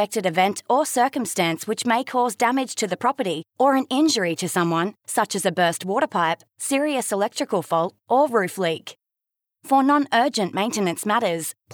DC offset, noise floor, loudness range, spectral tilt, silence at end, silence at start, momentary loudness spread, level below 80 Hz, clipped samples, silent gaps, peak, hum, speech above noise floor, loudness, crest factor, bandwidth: under 0.1%; -86 dBFS; 1 LU; -4 dB/octave; 0 s; 0 s; 6 LU; -80 dBFS; under 0.1%; none; -8 dBFS; none; 64 dB; -22 LUFS; 14 dB; over 20 kHz